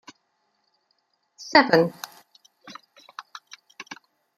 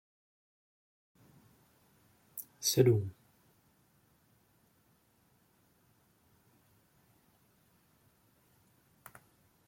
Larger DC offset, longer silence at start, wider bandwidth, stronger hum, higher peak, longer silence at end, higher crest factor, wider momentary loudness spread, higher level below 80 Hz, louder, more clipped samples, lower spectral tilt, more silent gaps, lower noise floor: neither; second, 1.4 s vs 2.35 s; about the same, 16 kHz vs 16.5 kHz; neither; first, 0 dBFS vs -12 dBFS; second, 0.55 s vs 6.55 s; about the same, 28 dB vs 28 dB; about the same, 27 LU vs 29 LU; about the same, -70 dBFS vs -74 dBFS; first, -19 LUFS vs -32 LUFS; neither; about the same, -4.5 dB/octave vs -5 dB/octave; neither; about the same, -72 dBFS vs -71 dBFS